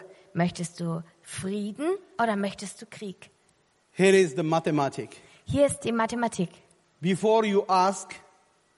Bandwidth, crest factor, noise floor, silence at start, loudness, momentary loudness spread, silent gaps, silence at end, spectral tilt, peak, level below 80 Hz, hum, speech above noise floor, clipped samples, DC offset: 11.5 kHz; 20 dB; -66 dBFS; 0 s; -26 LUFS; 18 LU; none; 0.6 s; -5.5 dB/octave; -8 dBFS; -62 dBFS; none; 40 dB; under 0.1%; under 0.1%